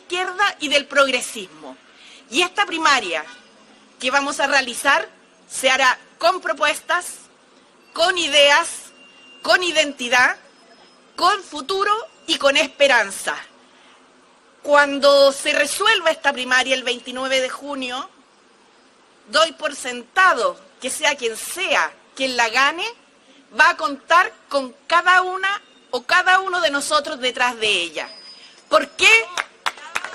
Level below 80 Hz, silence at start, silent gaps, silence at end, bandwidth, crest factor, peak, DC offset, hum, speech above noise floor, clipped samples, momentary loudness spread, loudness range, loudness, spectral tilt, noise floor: -62 dBFS; 0.1 s; none; 0 s; 13.5 kHz; 18 dB; -2 dBFS; under 0.1%; none; 34 dB; under 0.1%; 14 LU; 4 LU; -18 LUFS; 0 dB/octave; -53 dBFS